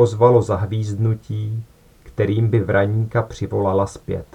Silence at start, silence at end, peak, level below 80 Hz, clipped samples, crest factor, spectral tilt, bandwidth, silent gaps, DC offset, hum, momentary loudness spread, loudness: 0 s; 0.1 s; 0 dBFS; -46 dBFS; under 0.1%; 18 dB; -8 dB/octave; 10 kHz; none; under 0.1%; none; 12 LU; -20 LUFS